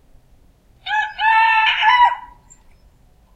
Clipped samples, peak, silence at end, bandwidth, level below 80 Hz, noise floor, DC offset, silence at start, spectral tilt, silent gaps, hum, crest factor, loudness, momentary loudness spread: under 0.1%; -2 dBFS; 1.1 s; 8.8 kHz; -52 dBFS; -51 dBFS; under 0.1%; 0.85 s; 0.5 dB/octave; none; none; 16 dB; -15 LUFS; 13 LU